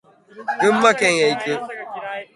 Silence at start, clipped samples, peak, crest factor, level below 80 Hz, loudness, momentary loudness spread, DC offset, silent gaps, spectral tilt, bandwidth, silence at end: 0.35 s; under 0.1%; 0 dBFS; 20 dB; -64 dBFS; -18 LUFS; 16 LU; under 0.1%; none; -3.5 dB/octave; 11.5 kHz; 0.1 s